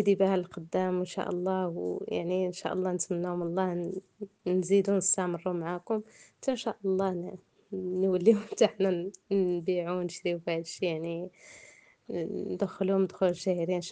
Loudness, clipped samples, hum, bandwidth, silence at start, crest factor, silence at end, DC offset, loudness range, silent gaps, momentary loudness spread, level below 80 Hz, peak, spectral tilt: -30 LUFS; under 0.1%; none; 9.6 kHz; 0 s; 20 dB; 0 s; under 0.1%; 4 LU; none; 12 LU; -74 dBFS; -10 dBFS; -5.5 dB/octave